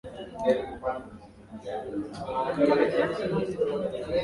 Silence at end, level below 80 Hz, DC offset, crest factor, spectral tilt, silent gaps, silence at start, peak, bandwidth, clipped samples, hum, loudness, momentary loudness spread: 0 s; -54 dBFS; under 0.1%; 18 dB; -7 dB/octave; none; 0.05 s; -10 dBFS; 11.5 kHz; under 0.1%; none; -28 LUFS; 17 LU